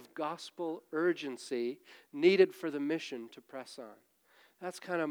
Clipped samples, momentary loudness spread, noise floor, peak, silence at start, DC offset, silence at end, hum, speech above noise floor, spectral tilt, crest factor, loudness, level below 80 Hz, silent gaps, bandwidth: under 0.1%; 20 LU; -67 dBFS; -12 dBFS; 0 s; under 0.1%; 0 s; none; 33 dB; -5 dB/octave; 22 dB; -33 LUFS; under -90 dBFS; none; 15 kHz